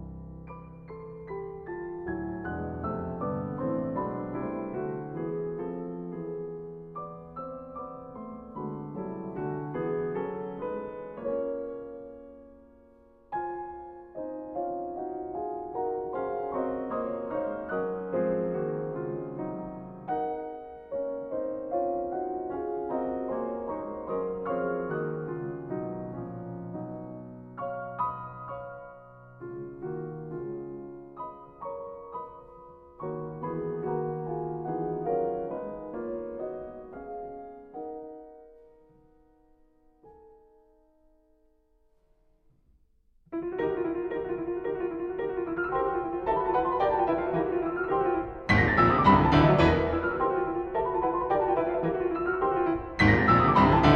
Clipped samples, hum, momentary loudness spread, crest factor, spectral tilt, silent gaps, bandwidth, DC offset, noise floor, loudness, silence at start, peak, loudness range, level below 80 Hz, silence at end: under 0.1%; none; 16 LU; 22 dB; -8.5 dB/octave; none; 7.4 kHz; under 0.1%; -66 dBFS; -30 LUFS; 0 s; -8 dBFS; 16 LU; -48 dBFS; 0 s